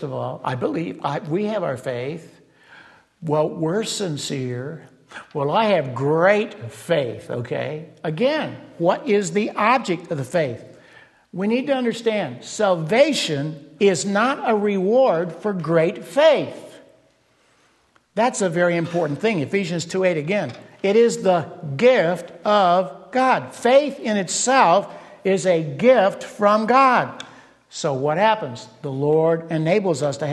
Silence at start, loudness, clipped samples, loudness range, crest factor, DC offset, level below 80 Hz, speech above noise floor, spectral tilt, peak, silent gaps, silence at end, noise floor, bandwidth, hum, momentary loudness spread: 0 s; -20 LUFS; under 0.1%; 6 LU; 18 dB; under 0.1%; -68 dBFS; 40 dB; -5 dB/octave; -2 dBFS; none; 0 s; -60 dBFS; 12.5 kHz; none; 13 LU